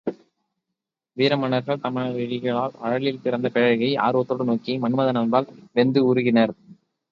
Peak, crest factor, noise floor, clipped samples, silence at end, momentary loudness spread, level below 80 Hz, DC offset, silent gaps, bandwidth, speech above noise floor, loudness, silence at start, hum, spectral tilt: -4 dBFS; 18 dB; -84 dBFS; under 0.1%; 0.4 s; 7 LU; -68 dBFS; under 0.1%; none; 6 kHz; 62 dB; -22 LUFS; 0.05 s; none; -8.5 dB/octave